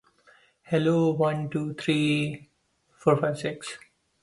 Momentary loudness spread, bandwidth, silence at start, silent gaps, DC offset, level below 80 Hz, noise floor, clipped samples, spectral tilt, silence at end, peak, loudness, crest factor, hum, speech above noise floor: 15 LU; 11.5 kHz; 0.7 s; none; under 0.1%; -66 dBFS; -67 dBFS; under 0.1%; -6.5 dB/octave; 0.45 s; -8 dBFS; -26 LUFS; 20 dB; none; 42 dB